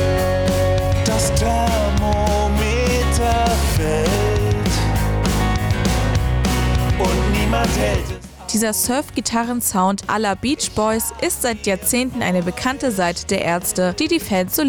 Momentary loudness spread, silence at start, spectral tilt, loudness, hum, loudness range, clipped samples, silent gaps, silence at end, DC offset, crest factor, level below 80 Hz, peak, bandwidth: 3 LU; 0 s; -4.5 dB/octave; -19 LUFS; none; 2 LU; under 0.1%; none; 0 s; under 0.1%; 10 dB; -24 dBFS; -8 dBFS; over 20 kHz